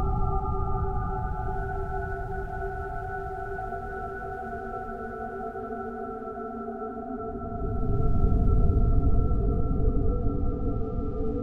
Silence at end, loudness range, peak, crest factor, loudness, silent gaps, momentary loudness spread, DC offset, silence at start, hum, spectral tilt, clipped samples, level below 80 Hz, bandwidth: 0 s; 8 LU; -10 dBFS; 16 dB; -31 LUFS; none; 10 LU; under 0.1%; 0 s; none; -10.5 dB/octave; under 0.1%; -30 dBFS; 2.6 kHz